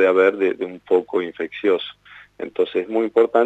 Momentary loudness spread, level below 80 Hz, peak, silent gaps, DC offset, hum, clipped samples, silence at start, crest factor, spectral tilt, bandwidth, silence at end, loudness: 13 LU; -68 dBFS; -4 dBFS; none; under 0.1%; 50 Hz at -65 dBFS; under 0.1%; 0 s; 16 dB; -6 dB/octave; 4.1 kHz; 0 s; -21 LUFS